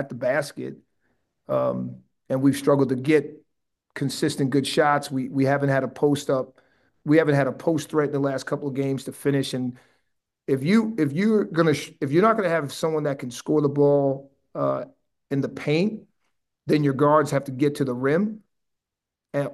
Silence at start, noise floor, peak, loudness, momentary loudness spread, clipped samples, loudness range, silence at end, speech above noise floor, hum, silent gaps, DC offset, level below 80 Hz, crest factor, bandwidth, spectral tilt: 0 s; -86 dBFS; -6 dBFS; -23 LUFS; 12 LU; under 0.1%; 3 LU; 0 s; 64 dB; none; none; under 0.1%; -68 dBFS; 18 dB; 12.5 kHz; -6.5 dB/octave